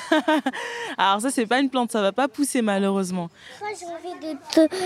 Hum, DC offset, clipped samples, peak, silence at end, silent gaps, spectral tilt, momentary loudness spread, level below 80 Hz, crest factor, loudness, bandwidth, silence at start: none; under 0.1%; under 0.1%; -4 dBFS; 0 s; none; -4 dB/octave; 13 LU; -72 dBFS; 18 dB; -23 LUFS; 15.5 kHz; 0 s